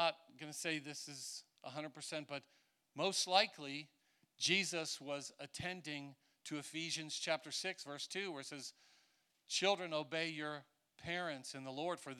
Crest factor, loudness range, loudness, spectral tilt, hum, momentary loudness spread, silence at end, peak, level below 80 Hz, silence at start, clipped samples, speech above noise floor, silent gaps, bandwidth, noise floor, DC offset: 26 dB; 5 LU; -41 LUFS; -2.5 dB/octave; none; 15 LU; 0 s; -18 dBFS; -84 dBFS; 0 s; under 0.1%; 35 dB; none; 16.5 kHz; -77 dBFS; under 0.1%